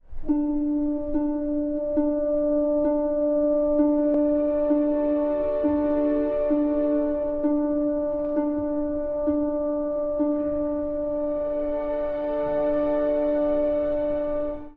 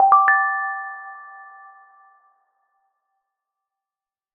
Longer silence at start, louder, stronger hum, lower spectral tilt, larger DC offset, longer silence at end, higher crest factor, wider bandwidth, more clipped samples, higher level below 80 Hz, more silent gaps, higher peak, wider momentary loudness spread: about the same, 0.1 s vs 0 s; second, -24 LUFS vs -18 LUFS; neither; first, -10.5 dB/octave vs -3.5 dB/octave; neither; second, 0.05 s vs 2.9 s; second, 12 dB vs 22 dB; first, 3.9 kHz vs 3.1 kHz; neither; first, -42 dBFS vs -78 dBFS; neither; second, -10 dBFS vs -2 dBFS; second, 5 LU vs 26 LU